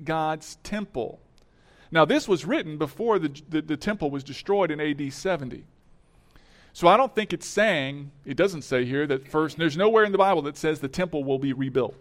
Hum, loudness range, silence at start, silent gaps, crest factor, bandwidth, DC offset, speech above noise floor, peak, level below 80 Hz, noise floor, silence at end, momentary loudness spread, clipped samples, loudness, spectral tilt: none; 4 LU; 0 s; none; 22 dB; 16 kHz; under 0.1%; 33 dB; -4 dBFS; -56 dBFS; -57 dBFS; 0.05 s; 13 LU; under 0.1%; -25 LUFS; -5.5 dB/octave